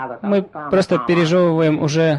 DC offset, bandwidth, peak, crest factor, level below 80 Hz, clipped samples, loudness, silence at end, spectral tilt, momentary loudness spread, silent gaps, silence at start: under 0.1%; 11.5 kHz; -6 dBFS; 10 dB; -52 dBFS; under 0.1%; -17 LUFS; 0 s; -6.5 dB/octave; 5 LU; none; 0 s